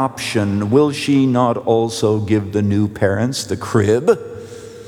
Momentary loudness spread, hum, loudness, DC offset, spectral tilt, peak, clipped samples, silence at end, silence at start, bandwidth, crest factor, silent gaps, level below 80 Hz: 6 LU; none; -17 LUFS; under 0.1%; -6 dB/octave; -2 dBFS; under 0.1%; 0 s; 0 s; 15 kHz; 16 dB; none; -54 dBFS